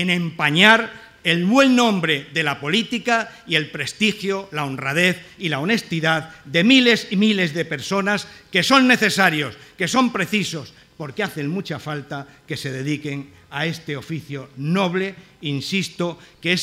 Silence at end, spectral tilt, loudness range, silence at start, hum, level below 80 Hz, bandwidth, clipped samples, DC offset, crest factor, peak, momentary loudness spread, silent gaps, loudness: 0 s; -4.5 dB/octave; 10 LU; 0 s; none; -60 dBFS; 16 kHz; under 0.1%; under 0.1%; 20 dB; 0 dBFS; 15 LU; none; -19 LUFS